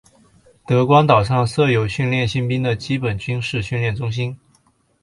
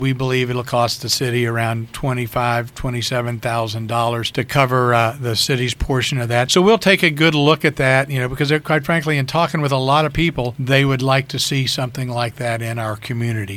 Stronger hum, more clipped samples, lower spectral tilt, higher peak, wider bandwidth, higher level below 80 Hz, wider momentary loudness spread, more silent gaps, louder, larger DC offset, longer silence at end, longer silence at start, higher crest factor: neither; neither; first, -6.5 dB/octave vs -5 dB/octave; about the same, 0 dBFS vs 0 dBFS; second, 11.5 kHz vs 16 kHz; about the same, -44 dBFS vs -40 dBFS; about the same, 10 LU vs 9 LU; neither; about the same, -18 LUFS vs -18 LUFS; neither; first, 0.65 s vs 0 s; first, 0.7 s vs 0 s; about the same, 18 dB vs 18 dB